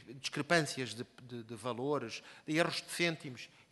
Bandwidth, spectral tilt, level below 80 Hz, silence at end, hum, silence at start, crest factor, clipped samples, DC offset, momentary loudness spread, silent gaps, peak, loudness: 12 kHz; -4 dB/octave; -76 dBFS; 0.25 s; none; 0 s; 24 dB; under 0.1%; under 0.1%; 15 LU; none; -14 dBFS; -36 LUFS